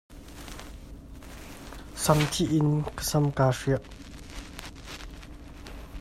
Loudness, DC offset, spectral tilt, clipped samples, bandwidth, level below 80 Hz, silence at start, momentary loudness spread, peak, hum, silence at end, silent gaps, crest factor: -26 LUFS; under 0.1%; -5.5 dB/octave; under 0.1%; 16 kHz; -46 dBFS; 0.1 s; 22 LU; -6 dBFS; none; 0 s; none; 24 dB